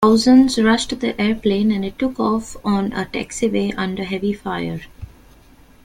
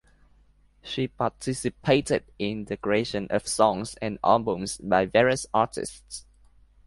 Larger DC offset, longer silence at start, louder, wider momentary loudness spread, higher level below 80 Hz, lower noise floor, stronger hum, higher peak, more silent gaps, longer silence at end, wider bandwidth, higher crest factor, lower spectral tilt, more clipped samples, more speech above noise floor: neither; second, 0 s vs 0.85 s; first, -19 LUFS vs -26 LUFS; about the same, 12 LU vs 13 LU; first, -44 dBFS vs -54 dBFS; second, -48 dBFS vs -60 dBFS; neither; first, -2 dBFS vs -6 dBFS; neither; first, 0.8 s vs 0.65 s; first, 13.5 kHz vs 11.5 kHz; second, 16 dB vs 22 dB; about the same, -5 dB/octave vs -4.5 dB/octave; neither; second, 29 dB vs 34 dB